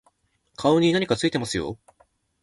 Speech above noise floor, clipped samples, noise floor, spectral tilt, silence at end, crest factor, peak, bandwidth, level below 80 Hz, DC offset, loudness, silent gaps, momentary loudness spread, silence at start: 45 dB; under 0.1%; -67 dBFS; -5 dB/octave; 0.7 s; 18 dB; -6 dBFS; 11.5 kHz; -54 dBFS; under 0.1%; -23 LUFS; none; 13 LU; 0.6 s